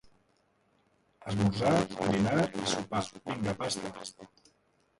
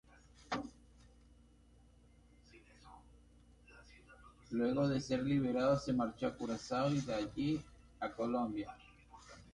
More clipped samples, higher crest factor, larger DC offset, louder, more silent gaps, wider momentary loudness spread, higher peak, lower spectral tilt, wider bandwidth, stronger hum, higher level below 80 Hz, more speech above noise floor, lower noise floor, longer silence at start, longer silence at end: neither; about the same, 20 dB vs 18 dB; neither; first, -31 LUFS vs -38 LUFS; neither; second, 13 LU vs 26 LU; first, -12 dBFS vs -22 dBFS; second, -5 dB/octave vs -6.5 dB/octave; about the same, 11.5 kHz vs 11 kHz; neither; first, -58 dBFS vs -64 dBFS; first, 40 dB vs 29 dB; first, -71 dBFS vs -65 dBFS; first, 1.2 s vs 0.4 s; first, 0.75 s vs 0.05 s